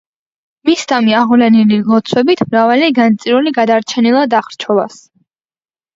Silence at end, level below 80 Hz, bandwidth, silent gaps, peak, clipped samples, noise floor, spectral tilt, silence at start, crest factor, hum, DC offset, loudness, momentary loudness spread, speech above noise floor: 1.1 s; -58 dBFS; 7.8 kHz; none; 0 dBFS; under 0.1%; under -90 dBFS; -5.5 dB/octave; 0.65 s; 12 dB; none; under 0.1%; -11 LUFS; 6 LU; over 79 dB